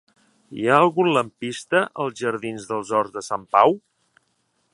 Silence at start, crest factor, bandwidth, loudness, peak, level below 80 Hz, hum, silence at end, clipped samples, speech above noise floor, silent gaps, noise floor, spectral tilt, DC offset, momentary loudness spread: 0.5 s; 22 dB; 11.5 kHz; -21 LUFS; -2 dBFS; -70 dBFS; none; 0.95 s; under 0.1%; 48 dB; none; -69 dBFS; -5 dB/octave; under 0.1%; 12 LU